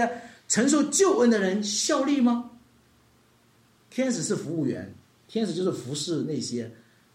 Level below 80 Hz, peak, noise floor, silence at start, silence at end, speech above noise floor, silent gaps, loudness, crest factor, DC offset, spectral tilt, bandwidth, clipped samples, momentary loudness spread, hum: -72 dBFS; -10 dBFS; -61 dBFS; 0 s; 0.4 s; 36 dB; none; -25 LUFS; 18 dB; under 0.1%; -4 dB/octave; 15.5 kHz; under 0.1%; 15 LU; none